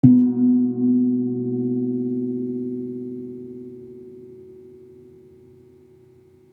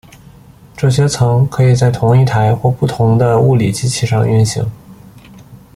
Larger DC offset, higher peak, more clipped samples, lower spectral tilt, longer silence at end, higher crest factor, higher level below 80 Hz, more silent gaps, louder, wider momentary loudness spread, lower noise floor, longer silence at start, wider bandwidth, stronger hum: neither; about the same, -2 dBFS vs -2 dBFS; neither; first, -13.5 dB/octave vs -6.5 dB/octave; first, 1.75 s vs 0.2 s; first, 22 dB vs 12 dB; second, -68 dBFS vs -40 dBFS; neither; second, -22 LUFS vs -13 LUFS; first, 24 LU vs 5 LU; first, -52 dBFS vs -40 dBFS; second, 0.05 s vs 0.75 s; second, 1.1 kHz vs 12.5 kHz; neither